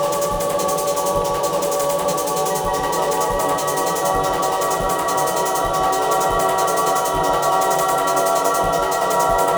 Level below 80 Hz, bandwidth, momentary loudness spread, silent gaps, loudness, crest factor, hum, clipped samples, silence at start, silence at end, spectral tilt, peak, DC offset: -40 dBFS; over 20 kHz; 3 LU; none; -19 LUFS; 14 dB; none; under 0.1%; 0 s; 0 s; -3 dB/octave; -6 dBFS; under 0.1%